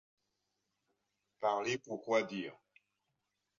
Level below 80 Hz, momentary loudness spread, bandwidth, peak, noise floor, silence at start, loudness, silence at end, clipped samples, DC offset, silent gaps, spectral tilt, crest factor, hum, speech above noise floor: -86 dBFS; 9 LU; 7.4 kHz; -18 dBFS; -85 dBFS; 1.4 s; -37 LUFS; 1.05 s; under 0.1%; under 0.1%; none; -3 dB/octave; 24 dB; none; 49 dB